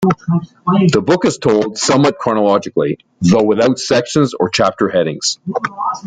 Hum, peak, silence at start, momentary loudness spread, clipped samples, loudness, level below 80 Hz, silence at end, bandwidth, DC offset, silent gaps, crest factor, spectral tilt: none; 0 dBFS; 0 s; 6 LU; under 0.1%; -14 LUFS; -50 dBFS; 0 s; 9.6 kHz; under 0.1%; none; 14 dB; -5 dB/octave